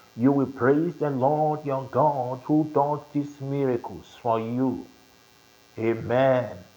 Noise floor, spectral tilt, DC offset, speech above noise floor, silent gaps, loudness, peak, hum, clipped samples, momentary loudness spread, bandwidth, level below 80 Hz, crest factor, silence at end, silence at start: -56 dBFS; -8.5 dB/octave; under 0.1%; 31 dB; none; -25 LUFS; -8 dBFS; none; under 0.1%; 8 LU; over 20 kHz; -66 dBFS; 16 dB; 0.15 s; 0.15 s